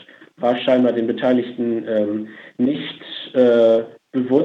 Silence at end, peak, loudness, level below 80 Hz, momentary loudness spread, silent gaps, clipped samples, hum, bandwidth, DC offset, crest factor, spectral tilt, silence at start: 0 s; -4 dBFS; -19 LUFS; -74 dBFS; 12 LU; none; under 0.1%; none; 6 kHz; under 0.1%; 16 dB; -7.5 dB/octave; 0.4 s